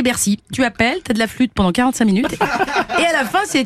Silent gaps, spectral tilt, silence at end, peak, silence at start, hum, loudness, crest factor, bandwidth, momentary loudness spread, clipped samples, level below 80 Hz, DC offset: none; -4 dB/octave; 0 s; 0 dBFS; 0 s; none; -17 LUFS; 16 dB; 15.5 kHz; 3 LU; under 0.1%; -42 dBFS; under 0.1%